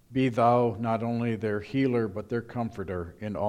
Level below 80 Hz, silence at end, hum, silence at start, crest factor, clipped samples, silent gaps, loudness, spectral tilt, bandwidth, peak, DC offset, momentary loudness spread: -58 dBFS; 0 s; none; 0.1 s; 18 dB; under 0.1%; none; -28 LUFS; -8.5 dB/octave; 11 kHz; -10 dBFS; under 0.1%; 12 LU